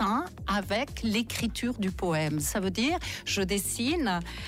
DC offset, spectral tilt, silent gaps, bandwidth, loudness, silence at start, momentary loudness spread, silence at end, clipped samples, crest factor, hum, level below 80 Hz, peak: under 0.1%; -4 dB/octave; none; 16 kHz; -29 LUFS; 0 s; 3 LU; 0 s; under 0.1%; 12 dB; none; -44 dBFS; -18 dBFS